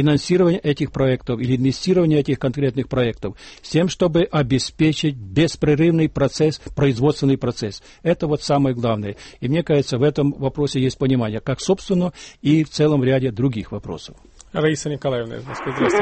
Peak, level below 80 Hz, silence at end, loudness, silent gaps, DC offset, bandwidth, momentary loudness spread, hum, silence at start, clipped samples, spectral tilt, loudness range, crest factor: -6 dBFS; -44 dBFS; 0 s; -20 LUFS; none; under 0.1%; 8.8 kHz; 11 LU; none; 0 s; under 0.1%; -6.5 dB/octave; 2 LU; 14 dB